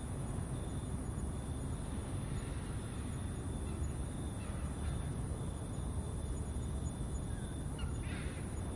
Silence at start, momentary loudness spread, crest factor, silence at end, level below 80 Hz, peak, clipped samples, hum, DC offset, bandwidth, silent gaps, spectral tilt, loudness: 0 s; 2 LU; 12 dB; 0 s; -44 dBFS; -26 dBFS; under 0.1%; none; under 0.1%; 11.5 kHz; none; -6 dB/octave; -42 LUFS